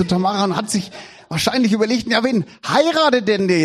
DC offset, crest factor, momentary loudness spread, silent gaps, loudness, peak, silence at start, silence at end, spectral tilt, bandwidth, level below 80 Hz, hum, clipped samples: under 0.1%; 16 dB; 8 LU; none; -18 LUFS; -2 dBFS; 0 s; 0 s; -4.5 dB/octave; 14 kHz; -54 dBFS; none; under 0.1%